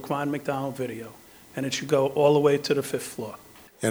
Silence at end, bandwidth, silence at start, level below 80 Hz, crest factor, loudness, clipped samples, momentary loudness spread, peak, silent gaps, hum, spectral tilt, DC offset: 0 s; over 20 kHz; 0 s; -66 dBFS; 18 dB; -25 LUFS; under 0.1%; 18 LU; -8 dBFS; none; none; -5 dB/octave; under 0.1%